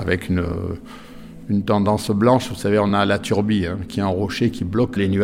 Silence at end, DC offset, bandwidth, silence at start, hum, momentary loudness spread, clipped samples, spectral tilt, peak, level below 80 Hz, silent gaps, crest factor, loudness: 0 s; under 0.1%; 15.5 kHz; 0 s; none; 13 LU; under 0.1%; -6.5 dB/octave; -4 dBFS; -46 dBFS; none; 16 dB; -20 LUFS